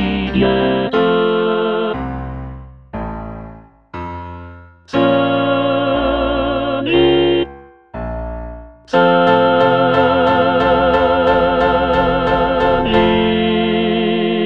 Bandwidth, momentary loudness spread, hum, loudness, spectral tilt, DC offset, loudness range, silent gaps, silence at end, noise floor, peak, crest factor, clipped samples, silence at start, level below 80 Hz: 6.8 kHz; 16 LU; none; -14 LUFS; -7.5 dB/octave; under 0.1%; 8 LU; none; 0 s; -37 dBFS; 0 dBFS; 14 dB; under 0.1%; 0 s; -34 dBFS